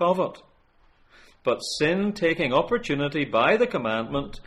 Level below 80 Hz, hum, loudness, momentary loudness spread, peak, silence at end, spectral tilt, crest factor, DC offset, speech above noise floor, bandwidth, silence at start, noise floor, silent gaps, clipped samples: -50 dBFS; none; -24 LUFS; 7 LU; -8 dBFS; 0.05 s; -5 dB/octave; 18 dB; under 0.1%; 35 dB; 13 kHz; 0 s; -59 dBFS; none; under 0.1%